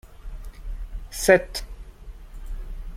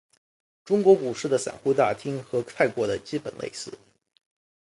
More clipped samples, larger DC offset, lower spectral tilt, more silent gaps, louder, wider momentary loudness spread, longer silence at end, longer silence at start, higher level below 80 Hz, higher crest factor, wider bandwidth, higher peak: neither; neither; about the same, -4 dB/octave vs -5 dB/octave; neither; first, -22 LUFS vs -25 LUFS; first, 26 LU vs 15 LU; second, 0 s vs 1 s; second, 0.05 s vs 0.65 s; first, -36 dBFS vs -64 dBFS; first, 26 dB vs 20 dB; first, 16.5 kHz vs 11.5 kHz; first, -2 dBFS vs -6 dBFS